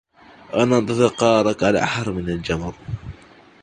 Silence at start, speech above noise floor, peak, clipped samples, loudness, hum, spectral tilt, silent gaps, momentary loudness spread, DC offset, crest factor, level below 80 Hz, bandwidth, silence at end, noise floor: 0.5 s; 28 dB; -2 dBFS; under 0.1%; -20 LUFS; none; -5.5 dB/octave; none; 16 LU; under 0.1%; 20 dB; -44 dBFS; 10 kHz; 0.5 s; -47 dBFS